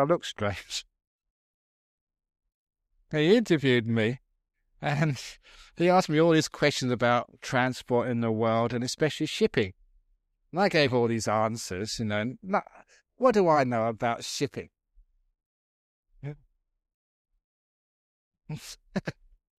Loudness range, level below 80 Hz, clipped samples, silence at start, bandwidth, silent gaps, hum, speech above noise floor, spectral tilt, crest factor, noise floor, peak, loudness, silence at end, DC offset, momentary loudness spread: 11 LU; -62 dBFS; under 0.1%; 0 s; 15 kHz; 1.07-1.19 s, 1.30-2.07 s, 2.54-2.67 s, 15.46-16.03 s, 16.94-17.25 s, 17.44-18.31 s; none; 45 dB; -5.5 dB/octave; 20 dB; -71 dBFS; -10 dBFS; -27 LUFS; 0.45 s; under 0.1%; 14 LU